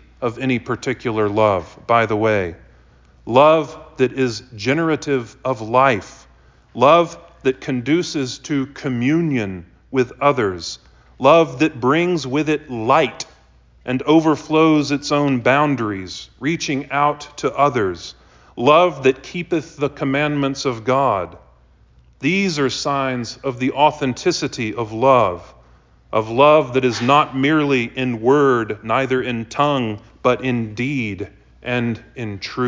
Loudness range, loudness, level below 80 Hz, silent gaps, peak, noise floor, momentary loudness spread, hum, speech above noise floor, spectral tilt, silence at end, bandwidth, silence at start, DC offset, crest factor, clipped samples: 4 LU; -18 LUFS; -50 dBFS; none; -2 dBFS; -51 dBFS; 12 LU; none; 33 dB; -5.5 dB/octave; 0 s; 7.6 kHz; 0.2 s; under 0.1%; 18 dB; under 0.1%